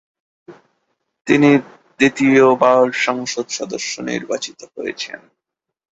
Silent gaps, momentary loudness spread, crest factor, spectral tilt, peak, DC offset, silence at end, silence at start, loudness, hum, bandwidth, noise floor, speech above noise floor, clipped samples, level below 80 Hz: none; 16 LU; 16 dB; -4.5 dB/octave; -2 dBFS; under 0.1%; 0.75 s; 0.5 s; -16 LUFS; none; 8 kHz; -70 dBFS; 54 dB; under 0.1%; -60 dBFS